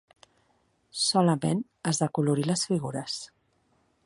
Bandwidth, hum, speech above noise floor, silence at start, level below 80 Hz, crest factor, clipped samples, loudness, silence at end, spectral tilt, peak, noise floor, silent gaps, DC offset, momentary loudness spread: 11.5 kHz; none; 42 dB; 0.95 s; -68 dBFS; 20 dB; under 0.1%; -27 LUFS; 0.8 s; -5 dB/octave; -10 dBFS; -69 dBFS; none; under 0.1%; 12 LU